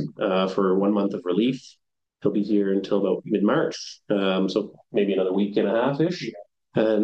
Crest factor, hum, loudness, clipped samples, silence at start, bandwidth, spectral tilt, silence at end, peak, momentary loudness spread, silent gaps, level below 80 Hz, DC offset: 16 dB; none; -24 LUFS; under 0.1%; 0 s; 8 kHz; -6.5 dB/octave; 0 s; -8 dBFS; 7 LU; none; -72 dBFS; under 0.1%